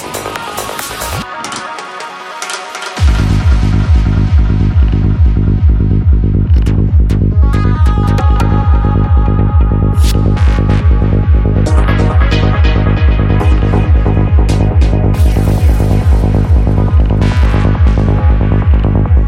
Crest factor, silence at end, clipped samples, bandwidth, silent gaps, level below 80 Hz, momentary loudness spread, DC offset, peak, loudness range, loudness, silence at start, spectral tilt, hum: 8 dB; 0 s; under 0.1%; 15 kHz; none; -12 dBFS; 9 LU; under 0.1%; 0 dBFS; 3 LU; -11 LUFS; 0 s; -7 dB/octave; none